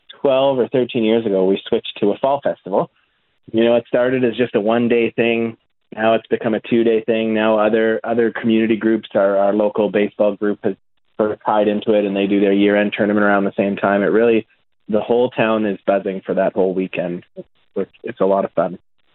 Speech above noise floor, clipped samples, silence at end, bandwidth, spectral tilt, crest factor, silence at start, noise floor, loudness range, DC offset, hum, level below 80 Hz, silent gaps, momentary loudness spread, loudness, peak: 44 dB; under 0.1%; 0.4 s; 4.2 kHz; -11 dB/octave; 16 dB; 0.25 s; -61 dBFS; 3 LU; under 0.1%; none; -60 dBFS; none; 7 LU; -17 LUFS; 0 dBFS